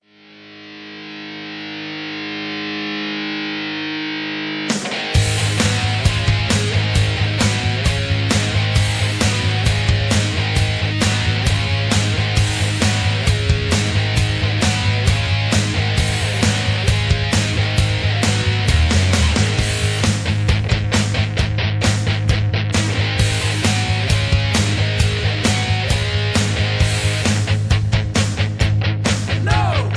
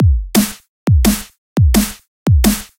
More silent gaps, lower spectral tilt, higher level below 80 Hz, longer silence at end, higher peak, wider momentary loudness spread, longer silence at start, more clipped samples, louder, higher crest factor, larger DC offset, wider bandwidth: second, none vs 0.68-0.86 s, 1.38-1.56 s, 2.08-2.26 s; about the same, -4.5 dB/octave vs -5.5 dB/octave; second, -28 dBFS vs -18 dBFS; second, 0 s vs 0.15 s; about the same, -2 dBFS vs 0 dBFS; second, 6 LU vs 9 LU; first, 0.35 s vs 0 s; neither; second, -18 LUFS vs -15 LUFS; about the same, 16 dB vs 14 dB; neither; second, 11 kHz vs 17 kHz